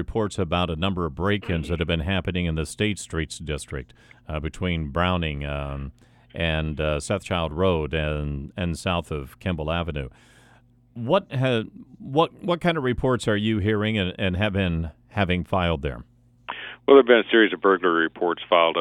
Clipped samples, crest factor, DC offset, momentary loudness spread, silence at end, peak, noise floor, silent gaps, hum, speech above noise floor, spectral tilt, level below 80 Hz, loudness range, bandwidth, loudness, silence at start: under 0.1%; 22 dB; under 0.1%; 14 LU; 0 s; -2 dBFS; -56 dBFS; none; none; 32 dB; -6 dB/octave; -40 dBFS; 7 LU; 12.5 kHz; -24 LUFS; 0 s